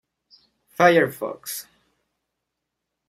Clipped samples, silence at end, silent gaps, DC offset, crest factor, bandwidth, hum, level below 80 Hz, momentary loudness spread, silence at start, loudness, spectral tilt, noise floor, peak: under 0.1%; 1.45 s; none; under 0.1%; 22 dB; 16 kHz; none; -70 dBFS; 17 LU; 0.8 s; -21 LUFS; -4.5 dB/octave; -81 dBFS; -2 dBFS